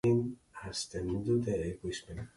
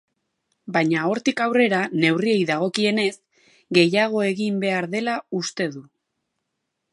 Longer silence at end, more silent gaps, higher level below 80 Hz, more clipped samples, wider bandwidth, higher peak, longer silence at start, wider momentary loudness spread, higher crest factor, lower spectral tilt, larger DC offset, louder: second, 0.1 s vs 1.1 s; neither; first, -54 dBFS vs -72 dBFS; neither; about the same, 11.5 kHz vs 11.5 kHz; second, -18 dBFS vs -2 dBFS; second, 0.05 s vs 0.65 s; first, 10 LU vs 7 LU; second, 16 dB vs 22 dB; about the same, -6 dB/octave vs -5 dB/octave; neither; second, -35 LUFS vs -21 LUFS